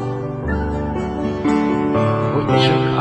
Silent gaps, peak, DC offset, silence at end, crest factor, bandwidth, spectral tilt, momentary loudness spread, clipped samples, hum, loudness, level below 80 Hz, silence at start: none; -2 dBFS; under 0.1%; 0 s; 16 dB; 9.4 kHz; -7.5 dB/octave; 8 LU; under 0.1%; none; -19 LUFS; -34 dBFS; 0 s